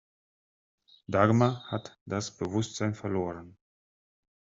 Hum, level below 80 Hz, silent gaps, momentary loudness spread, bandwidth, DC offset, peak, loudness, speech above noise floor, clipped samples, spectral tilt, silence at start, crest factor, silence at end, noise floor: none; -66 dBFS; 2.01-2.06 s; 13 LU; 7.8 kHz; under 0.1%; -6 dBFS; -30 LUFS; over 61 dB; under 0.1%; -6.5 dB/octave; 1.1 s; 24 dB; 1.05 s; under -90 dBFS